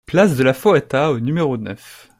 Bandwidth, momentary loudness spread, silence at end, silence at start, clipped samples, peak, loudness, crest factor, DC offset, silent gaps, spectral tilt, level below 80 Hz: 16 kHz; 14 LU; 0.25 s; 0.1 s; under 0.1%; -2 dBFS; -17 LUFS; 16 dB; under 0.1%; none; -6.5 dB/octave; -52 dBFS